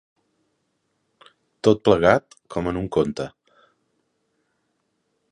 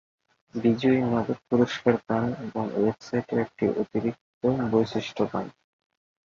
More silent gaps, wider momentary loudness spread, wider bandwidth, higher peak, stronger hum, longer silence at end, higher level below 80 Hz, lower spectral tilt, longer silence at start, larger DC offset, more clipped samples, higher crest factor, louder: second, none vs 4.21-4.41 s; first, 15 LU vs 8 LU; first, 10.5 kHz vs 7.2 kHz; first, 0 dBFS vs -6 dBFS; neither; first, 2.05 s vs 0.9 s; first, -50 dBFS vs -60 dBFS; about the same, -6.5 dB/octave vs -7.5 dB/octave; first, 1.65 s vs 0.55 s; neither; neither; about the same, 24 dB vs 20 dB; first, -21 LUFS vs -26 LUFS